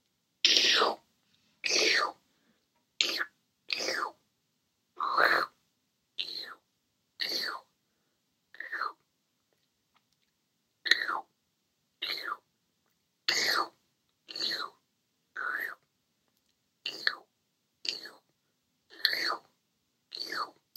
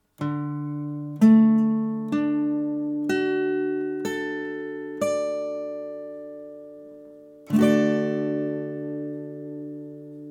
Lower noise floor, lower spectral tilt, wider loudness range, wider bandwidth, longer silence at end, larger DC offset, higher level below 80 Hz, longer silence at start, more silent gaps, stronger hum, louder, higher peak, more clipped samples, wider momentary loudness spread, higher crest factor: first, -78 dBFS vs -46 dBFS; second, 1 dB/octave vs -7 dB/octave; about the same, 8 LU vs 8 LU; first, 16 kHz vs 12.5 kHz; first, 0.25 s vs 0 s; neither; second, under -90 dBFS vs -72 dBFS; first, 0.45 s vs 0.2 s; neither; neither; second, -30 LUFS vs -24 LUFS; about the same, -4 dBFS vs -6 dBFS; neither; about the same, 17 LU vs 19 LU; first, 32 dB vs 18 dB